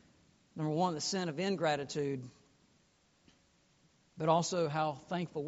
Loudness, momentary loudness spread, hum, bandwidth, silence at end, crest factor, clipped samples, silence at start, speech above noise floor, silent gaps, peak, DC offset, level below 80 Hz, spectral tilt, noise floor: -35 LUFS; 9 LU; none; 8 kHz; 0 s; 20 dB; under 0.1%; 0.55 s; 36 dB; none; -16 dBFS; under 0.1%; -74 dBFS; -4.5 dB/octave; -71 dBFS